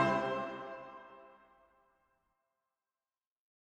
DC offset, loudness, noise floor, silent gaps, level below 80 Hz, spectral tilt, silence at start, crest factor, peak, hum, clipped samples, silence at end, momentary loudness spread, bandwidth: under 0.1%; -38 LUFS; under -90 dBFS; none; -72 dBFS; -6 dB/octave; 0 s; 24 dB; -18 dBFS; none; under 0.1%; 2.4 s; 24 LU; 10.5 kHz